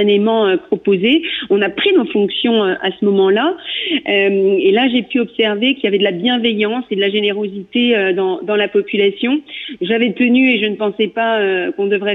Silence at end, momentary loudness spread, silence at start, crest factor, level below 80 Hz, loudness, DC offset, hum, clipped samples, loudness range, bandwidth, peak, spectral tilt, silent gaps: 0 s; 5 LU; 0 s; 12 dB; -62 dBFS; -15 LUFS; under 0.1%; none; under 0.1%; 1 LU; 4.1 kHz; -4 dBFS; -8 dB/octave; none